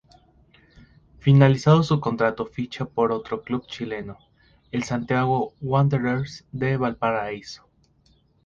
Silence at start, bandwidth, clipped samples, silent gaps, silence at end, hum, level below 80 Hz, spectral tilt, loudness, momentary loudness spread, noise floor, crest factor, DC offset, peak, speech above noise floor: 1.25 s; 7.4 kHz; under 0.1%; none; 0.9 s; none; -54 dBFS; -7.5 dB/octave; -23 LUFS; 15 LU; -61 dBFS; 22 dB; under 0.1%; -2 dBFS; 39 dB